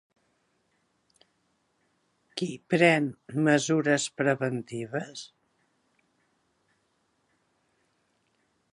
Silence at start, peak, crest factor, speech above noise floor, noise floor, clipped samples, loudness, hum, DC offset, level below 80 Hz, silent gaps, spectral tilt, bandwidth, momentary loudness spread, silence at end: 2.35 s; -6 dBFS; 24 dB; 47 dB; -73 dBFS; under 0.1%; -26 LUFS; none; under 0.1%; -78 dBFS; none; -5 dB/octave; 11.5 kHz; 13 LU; 3.45 s